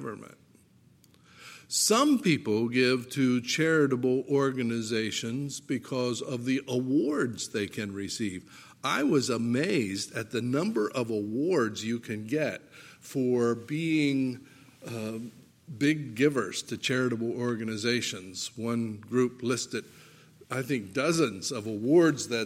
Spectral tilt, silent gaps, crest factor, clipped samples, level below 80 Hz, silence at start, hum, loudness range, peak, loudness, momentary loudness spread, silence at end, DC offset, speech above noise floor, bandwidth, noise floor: -4.5 dB/octave; none; 18 dB; under 0.1%; -74 dBFS; 0 s; none; 5 LU; -12 dBFS; -29 LUFS; 11 LU; 0 s; under 0.1%; 32 dB; 16 kHz; -60 dBFS